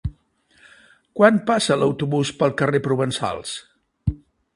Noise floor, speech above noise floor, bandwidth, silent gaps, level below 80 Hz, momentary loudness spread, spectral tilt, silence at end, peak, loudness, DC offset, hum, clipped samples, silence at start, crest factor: -59 dBFS; 40 dB; 11.5 kHz; none; -42 dBFS; 17 LU; -5.5 dB/octave; 0.4 s; 0 dBFS; -21 LUFS; under 0.1%; none; under 0.1%; 0.05 s; 22 dB